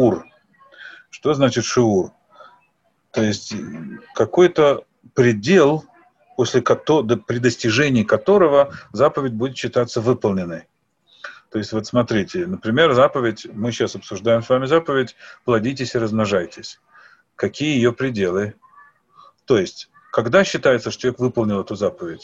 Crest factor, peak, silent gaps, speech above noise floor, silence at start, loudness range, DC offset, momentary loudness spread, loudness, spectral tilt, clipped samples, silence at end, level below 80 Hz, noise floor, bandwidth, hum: 18 dB; -2 dBFS; none; 46 dB; 0 s; 5 LU; under 0.1%; 15 LU; -19 LUFS; -5.5 dB/octave; under 0.1%; 0.05 s; -54 dBFS; -65 dBFS; 8 kHz; none